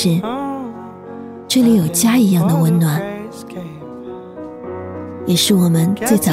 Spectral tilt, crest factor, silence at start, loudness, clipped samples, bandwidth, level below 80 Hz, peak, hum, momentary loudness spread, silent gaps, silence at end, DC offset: -5.5 dB/octave; 16 dB; 0 s; -15 LUFS; under 0.1%; 16 kHz; -54 dBFS; -2 dBFS; none; 19 LU; none; 0 s; under 0.1%